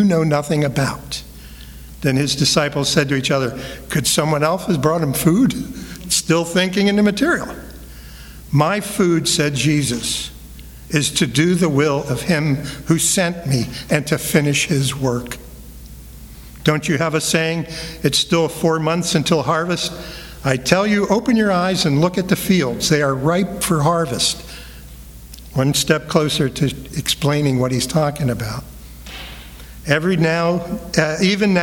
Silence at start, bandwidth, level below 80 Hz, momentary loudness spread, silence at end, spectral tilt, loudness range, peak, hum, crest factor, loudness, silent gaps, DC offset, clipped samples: 0 s; 19.5 kHz; -40 dBFS; 20 LU; 0 s; -4.5 dB/octave; 3 LU; 0 dBFS; none; 18 dB; -18 LUFS; none; under 0.1%; under 0.1%